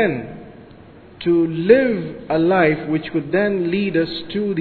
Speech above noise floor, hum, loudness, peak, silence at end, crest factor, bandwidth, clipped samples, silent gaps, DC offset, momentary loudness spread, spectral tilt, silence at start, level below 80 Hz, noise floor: 25 dB; none; -19 LUFS; 0 dBFS; 0 s; 18 dB; 4.6 kHz; under 0.1%; none; under 0.1%; 11 LU; -10 dB/octave; 0 s; -50 dBFS; -43 dBFS